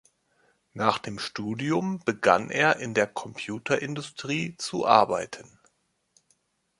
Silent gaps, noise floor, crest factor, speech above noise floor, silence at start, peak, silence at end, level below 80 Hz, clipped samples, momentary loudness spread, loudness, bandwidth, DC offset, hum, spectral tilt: none; -70 dBFS; 24 dB; 44 dB; 0.75 s; -2 dBFS; 1.4 s; -66 dBFS; under 0.1%; 14 LU; -26 LUFS; 11.5 kHz; under 0.1%; none; -4.5 dB/octave